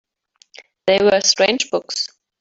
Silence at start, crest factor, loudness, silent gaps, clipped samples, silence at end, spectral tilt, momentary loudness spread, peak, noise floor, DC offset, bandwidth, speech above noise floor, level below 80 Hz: 0.85 s; 18 dB; -17 LUFS; none; under 0.1%; 0.35 s; -2 dB/octave; 11 LU; -2 dBFS; -58 dBFS; under 0.1%; 8 kHz; 41 dB; -60 dBFS